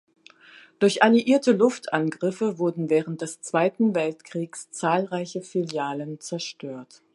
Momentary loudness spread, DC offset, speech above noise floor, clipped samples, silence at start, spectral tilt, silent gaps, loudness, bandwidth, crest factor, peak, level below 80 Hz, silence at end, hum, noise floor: 14 LU; under 0.1%; 28 dB; under 0.1%; 0.8 s; -5 dB/octave; none; -24 LUFS; 11.5 kHz; 22 dB; -2 dBFS; -76 dBFS; 0.3 s; none; -51 dBFS